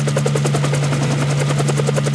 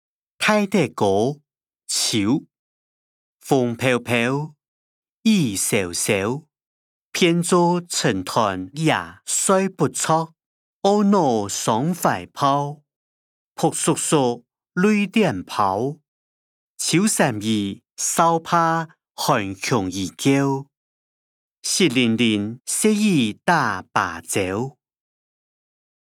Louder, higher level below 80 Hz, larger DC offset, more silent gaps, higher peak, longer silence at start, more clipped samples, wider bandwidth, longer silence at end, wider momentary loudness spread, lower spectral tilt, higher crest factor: first, -17 LUFS vs -20 LUFS; first, -46 dBFS vs -68 dBFS; neither; second, none vs 2.59-3.39 s, 4.68-5.02 s, 5.09-5.22 s, 6.66-7.12 s, 10.46-10.81 s, 12.96-13.55 s, 16.08-16.75 s, 20.77-21.62 s; about the same, -4 dBFS vs -2 dBFS; second, 0 s vs 0.4 s; neither; second, 11 kHz vs 17.5 kHz; second, 0 s vs 1.3 s; second, 1 LU vs 8 LU; first, -5.5 dB/octave vs -4 dB/octave; second, 12 dB vs 18 dB